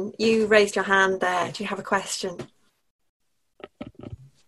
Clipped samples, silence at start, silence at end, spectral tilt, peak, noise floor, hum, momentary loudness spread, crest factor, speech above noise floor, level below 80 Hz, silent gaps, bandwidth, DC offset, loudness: under 0.1%; 0 s; 0.2 s; -3.5 dB/octave; -2 dBFS; -48 dBFS; none; 23 LU; 22 dB; 25 dB; -60 dBFS; 2.90-2.99 s, 3.09-3.20 s; 12.5 kHz; under 0.1%; -22 LUFS